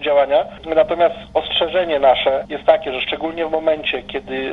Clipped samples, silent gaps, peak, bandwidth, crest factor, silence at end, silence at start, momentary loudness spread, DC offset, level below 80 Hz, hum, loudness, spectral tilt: under 0.1%; none; 0 dBFS; 5.4 kHz; 18 dB; 0 s; 0 s; 7 LU; under 0.1%; -46 dBFS; none; -18 LUFS; -5.5 dB/octave